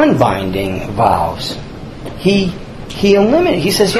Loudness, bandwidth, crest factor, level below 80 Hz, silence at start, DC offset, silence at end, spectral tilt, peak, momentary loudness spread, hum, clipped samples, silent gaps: -14 LUFS; 13.5 kHz; 14 dB; -34 dBFS; 0 s; under 0.1%; 0 s; -5.5 dB/octave; 0 dBFS; 17 LU; none; under 0.1%; none